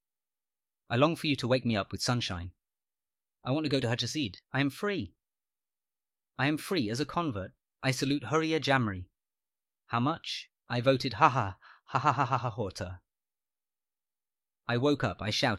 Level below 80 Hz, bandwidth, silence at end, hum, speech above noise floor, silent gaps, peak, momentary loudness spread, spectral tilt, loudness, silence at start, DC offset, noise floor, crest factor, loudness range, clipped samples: -62 dBFS; 15.5 kHz; 0 s; none; over 60 dB; none; -8 dBFS; 12 LU; -5.5 dB/octave; -30 LUFS; 0.9 s; under 0.1%; under -90 dBFS; 24 dB; 4 LU; under 0.1%